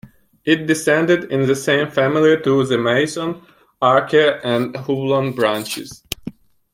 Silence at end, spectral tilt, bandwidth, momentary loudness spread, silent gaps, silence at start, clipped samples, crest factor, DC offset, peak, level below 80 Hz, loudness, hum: 0.45 s; -5 dB/octave; 16.5 kHz; 14 LU; none; 0.05 s; under 0.1%; 18 dB; under 0.1%; 0 dBFS; -56 dBFS; -17 LUFS; none